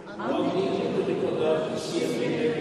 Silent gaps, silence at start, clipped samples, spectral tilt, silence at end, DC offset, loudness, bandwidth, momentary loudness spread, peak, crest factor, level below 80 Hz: none; 0 s; under 0.1%; -5.5 dB/octave; 0 s; under 0.1%; -27 LUFS; 13 kHz; 3 LU; -12 dBFS; 14 dB; -64 dBFS